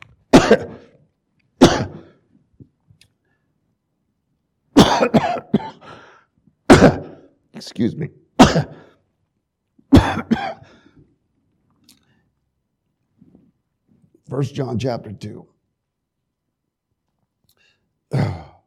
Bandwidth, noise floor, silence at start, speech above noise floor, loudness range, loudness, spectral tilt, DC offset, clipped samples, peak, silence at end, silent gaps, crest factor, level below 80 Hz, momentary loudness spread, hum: 16 kHz; -77 dBFS; 0.35 s; 55 dB; 14 LU; -16 LUFS; -5.5 dB/octave; under 0.1%; under 0.1%; 0 dBFS; 0.25 s; none; 20 dB; -38 dBFS; 22 LU; none